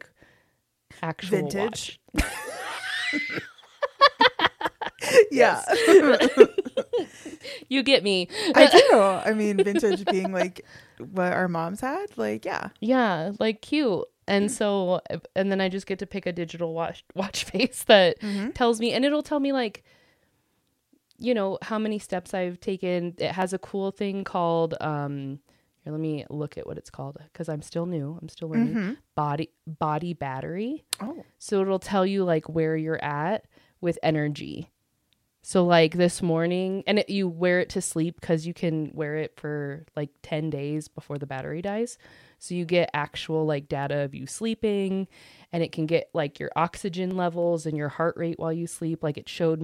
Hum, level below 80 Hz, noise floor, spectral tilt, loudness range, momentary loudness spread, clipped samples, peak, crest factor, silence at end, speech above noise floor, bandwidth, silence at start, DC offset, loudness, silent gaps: none; -54 dBFS; -72 dBFS; -5 dB/octave; 11 LU; 15 LU; under 0.1%; 0 dBFS; 26 dB; 0 s; 47 dB; 15.5 kHz; 1 s; under 0.1%; -25 LUFS; none